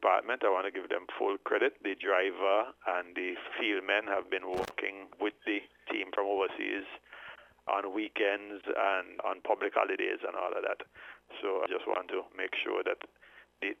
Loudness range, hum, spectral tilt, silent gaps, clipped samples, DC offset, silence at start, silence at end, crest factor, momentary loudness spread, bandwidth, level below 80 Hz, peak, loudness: 4 LU; 60 Hz at -80 dBFS; -4 dB/octave; none; under 0.1%; under 0.1%; 0 s; 0.05 s; 22 dB; 9 LU; 13 kHz; -74 dBFS; -12 dBFS; -33 LUFS